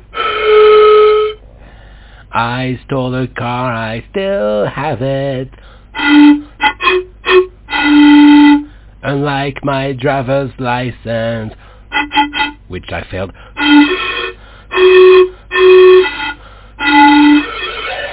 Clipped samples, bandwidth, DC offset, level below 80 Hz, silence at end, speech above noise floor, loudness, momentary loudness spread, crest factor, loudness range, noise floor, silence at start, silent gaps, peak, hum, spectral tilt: 2%; 4 kHz; under 0.1%; -38 dBFS; 0 s; 25 dB; -10 LUFS; 16 LU; 10 dB; 9 LU; -36 dBFS; 0.15 s; none; 0 dBFS; none; -9.5 dB/octave